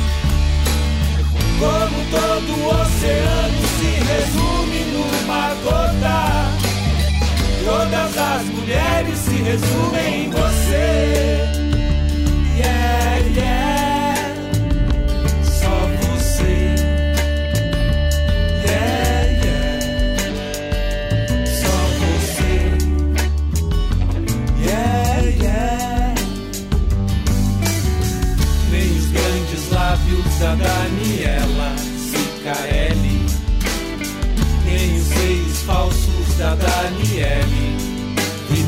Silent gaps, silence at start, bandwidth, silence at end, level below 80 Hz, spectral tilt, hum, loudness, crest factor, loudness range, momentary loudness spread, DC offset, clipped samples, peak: none; 0 s; 16.5 kHz; 0 s; -20 dBFS; -5 dB/octave; none; -18 LUFS; 12 dB; 2 LU; 4 LU; under 0.1%; under 0.1%; -6 dBFS